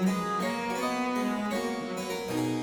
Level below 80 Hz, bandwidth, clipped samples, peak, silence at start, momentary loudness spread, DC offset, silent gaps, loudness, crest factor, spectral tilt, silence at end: -62 dBFS; over 20 kHz; under 0.1%; -18 dBFS; 0 s; 4 LU; under 0.1%; none; -31 LUFS; 12 dB; -5 dB/octave; 0 s